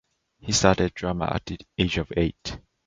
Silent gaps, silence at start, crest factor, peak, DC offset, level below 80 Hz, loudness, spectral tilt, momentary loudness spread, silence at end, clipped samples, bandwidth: none; 0.45 s; 24 dB; -2 dBFS; under 0.1%; -40 dBFS; -25 LUFS; -4.5 dB/octave; 15 LU; 0.3 s; under 0.1%; 9.6 kHz